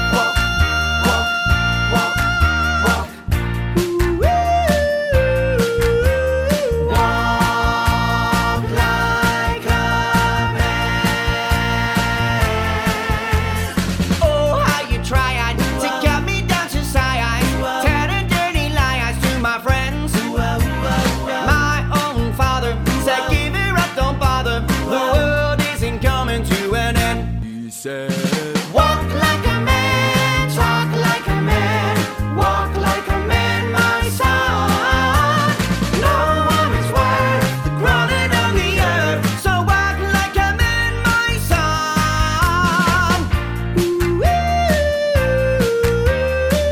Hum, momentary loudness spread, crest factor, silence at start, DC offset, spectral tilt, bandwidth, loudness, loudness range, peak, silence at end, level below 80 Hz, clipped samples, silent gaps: none; 4 LU; 16 dB; 0 s; under 0.1%; -5 dB/octave; 18 kHz; -17 LUFS; 2 LU; 0 dBFS; 0 s; -24 dBFS; under 0.1%; none